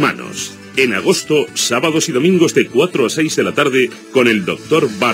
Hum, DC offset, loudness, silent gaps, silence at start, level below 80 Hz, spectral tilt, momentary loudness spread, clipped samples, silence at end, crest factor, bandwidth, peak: none; under 0.1%; -14 LUFS; none; 0 s; -62 dBFS; -4 dB/octave; 5 LU; under 0.1%; 0 s; 14 dB; 16 kHz; 0 dBFS